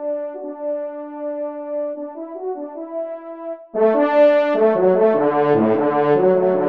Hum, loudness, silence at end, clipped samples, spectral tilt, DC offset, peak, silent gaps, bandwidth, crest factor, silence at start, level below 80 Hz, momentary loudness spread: none; -18 LUFS; 0 s; under 0.1%; -9 dB/octave; under 0.1%; -4 dBFS; none; 5.2 kHz; 14 dB; 0 s; -70 dBFS; 15 LU